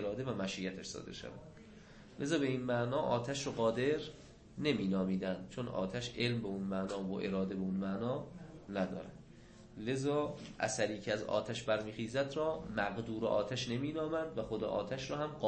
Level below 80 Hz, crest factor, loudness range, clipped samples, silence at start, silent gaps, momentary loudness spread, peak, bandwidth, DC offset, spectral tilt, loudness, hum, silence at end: -62 dBFS; 18 dB; 3 LU; under 0.1%; 0 s; none; 15 LU; -20 dBFS; 8.4 kHz; under 0.1%; -5.5 dB/octave; -37 LUFS; none; 0 s